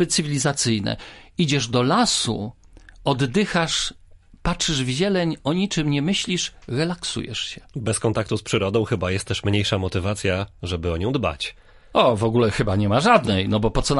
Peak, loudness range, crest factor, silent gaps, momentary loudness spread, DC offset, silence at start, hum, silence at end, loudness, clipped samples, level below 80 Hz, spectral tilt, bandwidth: -2 dBFS; 3 LU; 20 dB; none; 10 LU; under 0.1%; 0 s; none; 0 s; -22 LUFS; under 0.1%; -40 dBFS; -4.5 dB/octave; 11.5 kHz